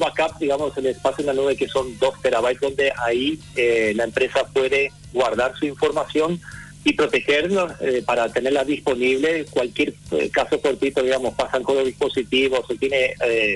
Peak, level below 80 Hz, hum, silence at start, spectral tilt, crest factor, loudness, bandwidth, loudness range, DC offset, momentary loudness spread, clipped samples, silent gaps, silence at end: -8 dBFS; -50 dBFS; none; 0 s; -4.5 dB/octave; 12 dB; -21 LUFS; 12 kHz; 1 LU; under 0.1%; 4 LU; under 0.1%; none; 0 s